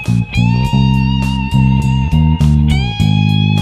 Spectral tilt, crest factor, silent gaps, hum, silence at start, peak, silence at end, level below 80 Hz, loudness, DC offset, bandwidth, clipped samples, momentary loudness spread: -7 dB/octave; 12 dB; none; none; 0 s; 0 dBFS; 0 s; -20 dBFS; -13 LUFS; 0.2%; 11 kHz; under 0.1%; 3 LU